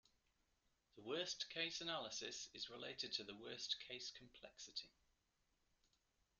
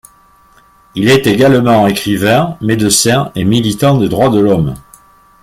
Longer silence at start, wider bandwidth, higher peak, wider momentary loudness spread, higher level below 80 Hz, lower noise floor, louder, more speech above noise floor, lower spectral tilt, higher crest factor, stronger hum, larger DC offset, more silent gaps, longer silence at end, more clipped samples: about the same, 0.95 s vs 0.95 s; second, 11.5 kHz vs 16.5 kHz; second, -30 dBFS vs 0 dBFS; first, 13 LU vs 6 LU; second, -84 dBFS vs -40 dBFS; first, -85 dBFS vs -46 dBFS; second, -48 LUFS vs -11 LUFS; about the same, 35 dB vs 36 dB; second, -1.5 dB/octave vs -5 dB/octave; first, 24 dB vs 12 dB; neither; neither; neither; first, 1.5 s vs 0.6 s; neither